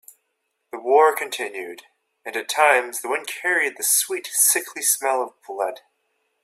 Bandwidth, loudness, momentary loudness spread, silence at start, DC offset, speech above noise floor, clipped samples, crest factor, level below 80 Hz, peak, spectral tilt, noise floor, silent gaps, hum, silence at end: 16 kHz; -20 LUFS; 14 LU; 0.75 s; under 0.1%; 53 dB; under 0.1%; 20 dB; -80 dBFS; -2 dBFS; 1.5 dB/octave; -75 dBFS; none; none; 0.7 s